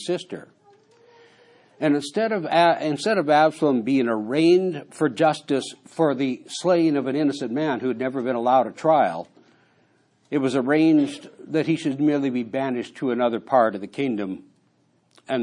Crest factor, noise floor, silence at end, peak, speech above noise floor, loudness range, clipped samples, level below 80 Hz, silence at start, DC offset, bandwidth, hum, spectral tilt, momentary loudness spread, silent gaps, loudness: 16 dB; -64 dBFS; 0 s; -6 dBFS; 42 dB; 4 LU; under 0.1%; -76 dBFS; 0 s; under 0.1%; 11 kHz; none; -6 dB/octave; 10 LU; none; -22 LUFS